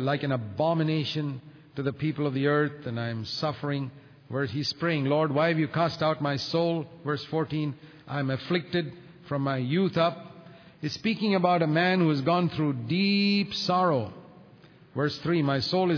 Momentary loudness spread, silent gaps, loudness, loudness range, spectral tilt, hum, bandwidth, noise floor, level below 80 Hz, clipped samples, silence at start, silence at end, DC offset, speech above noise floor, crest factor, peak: 11 LU; none; -27 LUFS; 5 LU; -7 dB/octave; none; 5.4 kHz; -53 dBFS; -66 dBFS; under 0.1%; 0 s; 0 s; under 0.1%; 27 dB; 18 dB; -10 dBFS